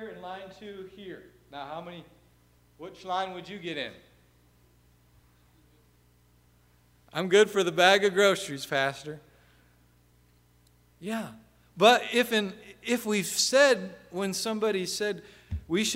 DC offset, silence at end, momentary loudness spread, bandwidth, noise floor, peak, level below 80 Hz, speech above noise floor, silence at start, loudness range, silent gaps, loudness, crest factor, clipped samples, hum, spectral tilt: under 0.1%; 0 s; 22 LU; 16 kHz; -63 dBFS; -6 dBFS; -58 dBFS; 35 dB; 0 s; 14 LU; none; -26 LUFS; 24 dB; under 0.1%; 60 Hz at -60 dBFS; -3 dB/octave